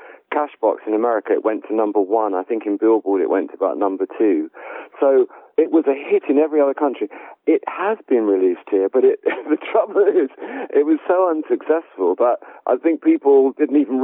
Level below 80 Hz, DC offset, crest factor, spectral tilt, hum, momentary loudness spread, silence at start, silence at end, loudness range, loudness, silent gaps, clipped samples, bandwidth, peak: under -90 dBFS; under 0.1%; 14 dB; -10 dB/octave; none; 7 LU; 0 s; 0 s; 2 LU; -18 LUFS; none; under 0.1%; 3.8 kHz; -4 dBFS